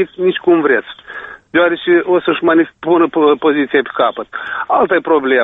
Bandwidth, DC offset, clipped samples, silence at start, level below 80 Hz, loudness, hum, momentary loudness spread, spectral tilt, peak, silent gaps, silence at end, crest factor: 4 kHz; under 0.1%; under 0.1%; 0 s; -56 dBFS; -13 LUFS; none; 11 LU; -8 dB/octave; 0 dBFS; none; 0 s; 12 dB